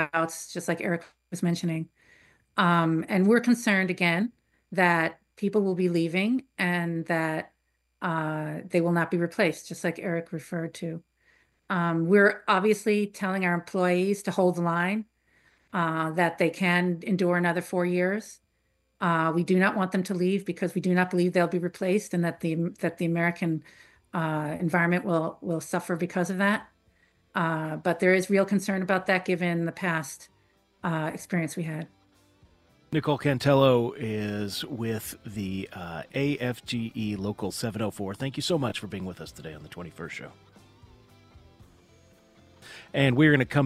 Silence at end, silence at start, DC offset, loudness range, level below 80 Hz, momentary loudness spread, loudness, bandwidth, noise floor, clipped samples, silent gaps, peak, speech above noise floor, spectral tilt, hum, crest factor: 0 s; 0 s; under 0.1%; 7 LU; -64 dBFS; 12 LU; -27 LUFS; 15 kHz; -72 dBFS; under 0.1%; none; -6 dBFS; 46 dB; -6 dB/octave; none; 20 dB